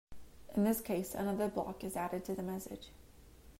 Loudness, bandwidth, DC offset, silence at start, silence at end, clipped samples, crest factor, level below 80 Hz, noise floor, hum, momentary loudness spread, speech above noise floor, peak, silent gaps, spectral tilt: -38 LUFS; 16 kHz; under 0.1%; 0.1 s; 0 s; under 0.1%; 18 dB; -60 dBFS; -58 dBFS; none; 12 LU; 21 dB; -20 dBFS; none; -6 dB/octave